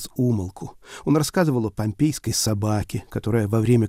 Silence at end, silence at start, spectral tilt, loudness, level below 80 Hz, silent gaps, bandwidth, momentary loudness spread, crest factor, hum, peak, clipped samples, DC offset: 0 s; 0 s; -5.5 dB/octave; -23 LUFS; -46 dBFS; none; 16 kHz; 10 LU; 16 dB; none; -6 dBFS; under 0.1%; under 0.1%